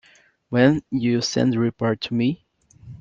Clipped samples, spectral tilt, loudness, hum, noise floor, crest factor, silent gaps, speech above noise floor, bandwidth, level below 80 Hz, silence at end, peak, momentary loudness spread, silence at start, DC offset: under 0.1%; -6 dB/octave; -21 LUFS; none; -45 dBFS; 18 dB; none; 24 dB; 7.6 kHz; -56 dBFS; 0.05 s; -4 dBFS; 7 LU; 0.5 s; under 0.1%